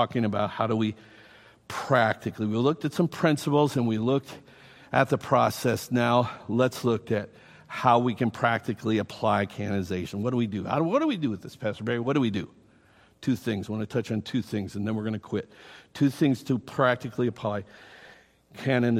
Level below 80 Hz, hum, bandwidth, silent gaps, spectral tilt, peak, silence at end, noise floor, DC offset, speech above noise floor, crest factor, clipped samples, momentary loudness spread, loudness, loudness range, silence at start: -64 dBFS; none; 16 kHz; none; -6.5 dB/octave; -6 dBFS; 0 s; -59 dBFS; under 0.1%; 33 dB; 22 dB; under 0.1%; 10 LU; -27 LUFS; 4 LU; 0 s